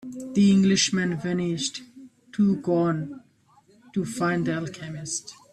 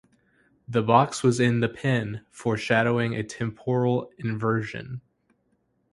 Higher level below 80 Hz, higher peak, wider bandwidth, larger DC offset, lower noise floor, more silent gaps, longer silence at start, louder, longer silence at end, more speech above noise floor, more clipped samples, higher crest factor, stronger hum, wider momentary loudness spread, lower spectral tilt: about the same, -62 dBFS vs -60 dBFS; second, -10 dBFS vs -4 dBFS; about the same, 11.5 kHz vs 11.5 kHz; neither; second, -59 dBFS vs -70 dBFS; neither; second, 0 s vs 0.7 s; about the same, -24 LUFS vs -25 LUFS; second, 0.2 s vs 0.95 s; second, 36 dB vs 46 dB; neither; second, 16 dB vs 22 dB; neither; first, 16 LU vs 12 LU; about the same, -5 dB/octave vs -6 dB/octave